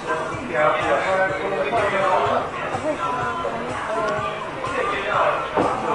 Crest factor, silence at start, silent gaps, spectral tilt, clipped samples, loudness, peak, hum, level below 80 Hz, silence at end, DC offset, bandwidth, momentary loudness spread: 16 dB; 0 s; none; -5 dB/octave; under 0.1%; -22 LUFS; -6 dBFS; none; -50 dBFS; 0 s; under 0.1%; 11.5 kHz; 7 LU